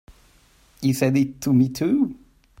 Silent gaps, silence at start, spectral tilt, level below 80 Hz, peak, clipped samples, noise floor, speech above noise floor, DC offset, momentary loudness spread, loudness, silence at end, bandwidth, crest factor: none; 0.8 s; -6.5 dB/octave; -54 dBFS; -6 dBFS; under 0.1%; -56 dBFS; 36 dB; under 0.1%; 6 LU; -22 LUFS; 0.45 s; 16 kHz; 16 dB